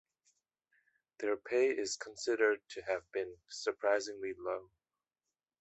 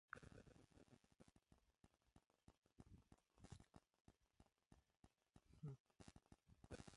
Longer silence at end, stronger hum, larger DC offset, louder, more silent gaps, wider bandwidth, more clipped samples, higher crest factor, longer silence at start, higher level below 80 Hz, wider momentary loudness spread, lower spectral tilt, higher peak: first, 0.95 s vs 0 s; neither; neither; first, -36 LUFS vs -64 LUFS; second, none vs 4.00-4.05 s, 5.80-5.85 s; second, 8.2 kHz vs 11 kHz; neither; second, 20 dB vs 28 dB; first, 1.2 s vs 0.1 s; about the same, -78 dBFS vs -78 dBFS; about the same, 9 LU vs 9 LU; second, -2 dB/octave vs -5.5 dB/octave; first, -18 dBFS vs -38 dBFS